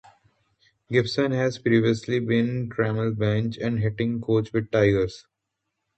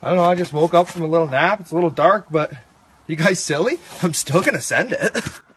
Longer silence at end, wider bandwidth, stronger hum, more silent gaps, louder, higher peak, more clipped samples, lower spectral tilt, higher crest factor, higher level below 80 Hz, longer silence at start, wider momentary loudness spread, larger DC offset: first, 0.75 s vs 0.2 s; second, 8.4 kHz vs 13 kHz; neither; neither; second, -24 LUFS vs -19 LUFS; second, -6 dBFS vs 0 dBFS; neither; first, -7.5 dB/octave vs -4.5 dB/octave; about the same, 18 dB vs 18 dB; first, -52 dBFS vs -58 dBFS; first, 0.9 s vs 0 s; about the same, 5 LU vs 6 LU; neither